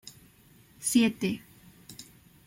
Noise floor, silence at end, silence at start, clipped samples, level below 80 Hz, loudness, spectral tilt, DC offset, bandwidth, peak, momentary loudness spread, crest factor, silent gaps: -58 dBFS; 0.45 s; 0.05 s; under 0.1%; -66 dBFS; -28 LUFS; -3.5 dB/octave; under 0.1%; 16.5 kHz; -12 dBFS; 23 LU; 20 dB; none